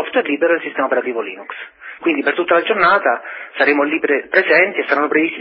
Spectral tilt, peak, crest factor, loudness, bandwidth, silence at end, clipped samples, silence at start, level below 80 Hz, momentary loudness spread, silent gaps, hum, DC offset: -9 dB/octave; 0 dBFS; 16 dB; -16 LUFS; 5.8 kHz; 0 s; under 0.1%; 0 s; -68 dBFS; 14 LU; none; none; under 0.1%